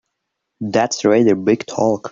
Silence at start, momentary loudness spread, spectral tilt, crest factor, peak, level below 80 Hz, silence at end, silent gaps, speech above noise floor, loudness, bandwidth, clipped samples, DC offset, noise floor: 0.6 s; 6 LU; -5 dB/octave; 14 dB; -2 dBFS; -60 dBFS; 0 s; none; 60 dB; -16 LUFS; 7.6 kHz; under 0.1%; under 0.1%; -76 dBFS